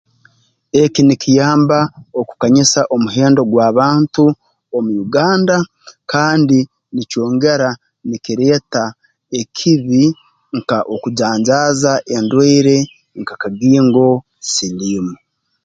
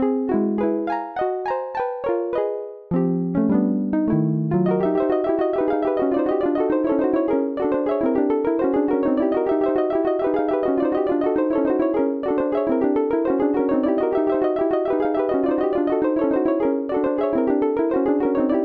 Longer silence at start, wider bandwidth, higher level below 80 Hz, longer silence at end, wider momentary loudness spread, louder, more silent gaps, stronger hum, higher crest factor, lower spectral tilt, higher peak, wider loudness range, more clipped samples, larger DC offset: first, 0.75 s vs 0 s; first, 9.2 kHz vs 4.9 kHz; about the same, -54 dBFS vs -54 dBFS; first, 0.5 s vs 0 s; first, 13 LU vs 3 LU; first, -14 LUFS vs -21 LUFS; neither; neither; about the same, 14 dB vs 12 dB; second, -5 dB/octave vs -11 dB/octave; first, 0 dBFS vs -8 dBFS; about the same, 4 LU vs 2 LU; neither; neither